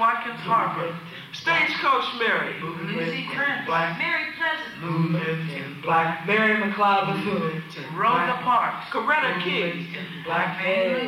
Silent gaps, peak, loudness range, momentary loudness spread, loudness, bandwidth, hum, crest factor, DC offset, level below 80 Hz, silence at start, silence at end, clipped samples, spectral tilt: none; -10 dBFS; 3 LU; 10 LU; -24 LUFS; 15.5 kHz; none; 14 dB; under 0.1%; -68 dBFS; 0 s; 0 s; under 0.1%; -6 dB/octave